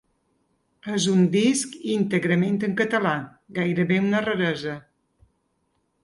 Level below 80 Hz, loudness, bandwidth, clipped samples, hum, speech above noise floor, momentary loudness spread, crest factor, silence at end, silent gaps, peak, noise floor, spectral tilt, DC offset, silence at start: -64 dBFS; -23 LUFS; 11.5 kHz; under 0.1%; none; 49 dB; 11 LU; 18 dB; 1.25 s; none; -8 dBFS; -71 dBFS; -5.5 dB/octave; under 0.1%; 0.85 s